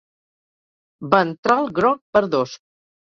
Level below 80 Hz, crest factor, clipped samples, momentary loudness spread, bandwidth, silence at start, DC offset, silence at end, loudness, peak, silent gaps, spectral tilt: -60 dBFS; 20 dB; under 0.1%; 7 LU; 7.6 kHz; 1 s; under 0.1%; 0.5 s; -19 LUFS; -2 dBFS; 1.38-1.43 s, 2.01-2.13 s; -6 dB/octave